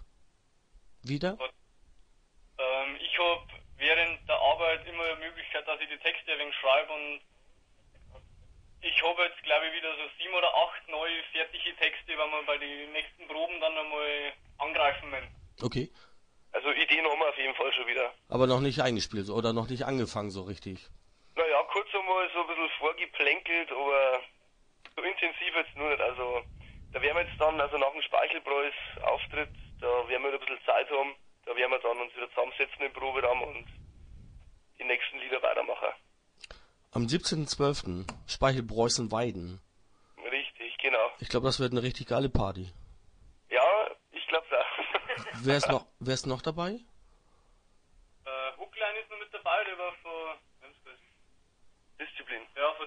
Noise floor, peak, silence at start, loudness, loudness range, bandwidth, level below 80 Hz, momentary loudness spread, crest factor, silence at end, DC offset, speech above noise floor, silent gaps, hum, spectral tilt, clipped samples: -65 dBFS; -8 dBFS; 0 s; -30 LUFS; 6 LU; 10.5 kHz; -54 dBFS; 13 LU; 24 dB; 0 s; under 0.1%; 35 dB; none; none; -4 dB/octave; under 0.1%